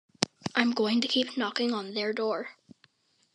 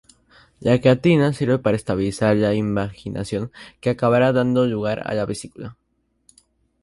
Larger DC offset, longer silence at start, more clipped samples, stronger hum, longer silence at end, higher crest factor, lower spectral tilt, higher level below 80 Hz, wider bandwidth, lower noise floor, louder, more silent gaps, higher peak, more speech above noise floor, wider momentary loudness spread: neither; second, 0.2 s vs 0.6 s; neither; neither; second, 0.8 s vs 1.1 s; first, 28 dB vs 18 dB; second, -3.5 dB/octave vs -7 dB/octave; second, -78 dBFS vs -50 dBFS; about the same, 11 kHz vs 11.5 kHz; first, -66 dBFS vs -60 dBFS; second, -29 LUFS vs -20 LUFS; neither; about the same, -2 dBFS vs -4 dBFS; about the same, 37 dB vs 40 dB; second, 6 LU vs 13 LU